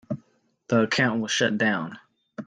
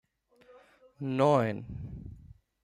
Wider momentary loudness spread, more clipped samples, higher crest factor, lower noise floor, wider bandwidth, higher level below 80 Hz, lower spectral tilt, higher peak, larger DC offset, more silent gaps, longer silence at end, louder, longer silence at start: second, 15 LU vs 20 LU; neither; about the same, 18 dB vs 22 dB; about the same, -65 dBFS vs -62 dBFS; second, 9.8 kHz vs 12 kHz; second, -64 dBFS vs -56 dBFS; second, -4.5 dB/octave vs -7.5 dB/octave; first, -8 dBFS vs -12 dBFS; neither; neither; second, 0 s vs 0.45 s; first, -23 LUFS vs -29 LUFS; second, 0.1 s vs 0.5 s